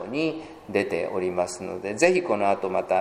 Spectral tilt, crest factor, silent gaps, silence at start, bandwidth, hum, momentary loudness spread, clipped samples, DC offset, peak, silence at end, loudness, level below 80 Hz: -4.5 dB/octave; 22 dB; none; 0 s; 15 kHz; none; 9 LU; under 0.1%; under 0.1%; -4 dBFS; 0 s; -25 LUFS; -62 dBFS